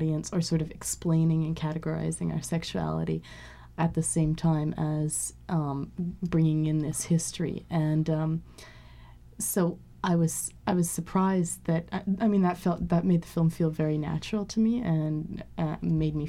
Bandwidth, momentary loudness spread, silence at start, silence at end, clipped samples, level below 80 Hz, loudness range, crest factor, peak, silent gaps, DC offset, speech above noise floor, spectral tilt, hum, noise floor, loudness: 14.5 kHz; 8 LU; 0 s; 0 s; under 0.1%; -50 dBFS; 3 LU; 16 dB; -12 dBFS; none; under 0.1%; 22 dB; -6 dB/octave; none; -50 dBFS; -28 LUFS